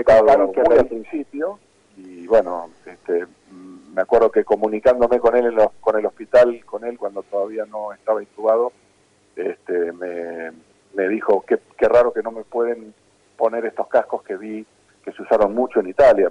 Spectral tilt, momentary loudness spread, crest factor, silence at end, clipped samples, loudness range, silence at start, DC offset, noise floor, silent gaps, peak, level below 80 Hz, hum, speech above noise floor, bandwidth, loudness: -6.5 dB/octave; 15 LU; 14 dB; 0 s; under 0.1%; 7 LU; 0 s; under 0.1%; -58 dBFS; none; -6 dBFS; -50 dBFS; none; 39 dB; 10 kHz; -19 LUFS